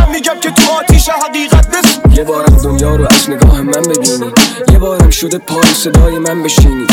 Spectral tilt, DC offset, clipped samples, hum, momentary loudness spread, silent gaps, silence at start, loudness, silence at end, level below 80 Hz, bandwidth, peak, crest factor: -4.5 dB/octave; under 0.1%; 0.5%; none; 4 LU; none; 0 s; -9 LUFS; 0 s; -12 dBFS; 18.5 kHz; 0 dBFS; 8 dB